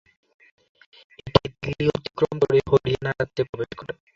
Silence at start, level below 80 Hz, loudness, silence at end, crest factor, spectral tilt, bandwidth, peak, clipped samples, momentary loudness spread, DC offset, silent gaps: 1.25 s; -48 dBFS; -24 LUFS; 0.25 s; 24 dB; -7 dB/octave; 7.4 kHz; -2 dBFS; under 0.1%; 12 LU; under 0.1%; 3.49-3.53 s